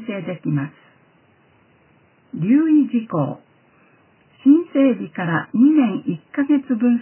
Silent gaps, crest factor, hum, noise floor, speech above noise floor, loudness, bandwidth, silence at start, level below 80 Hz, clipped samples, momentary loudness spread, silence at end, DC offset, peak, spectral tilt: none; 16 dB; none; -56 dBFS; 38 dB; -19 LUFS; 3.2 kHz; 0 s; -70 dBFS; under 0.1%; 12 LU; 0 s; under 0.1%; -4 dBFS; -12 dB/octave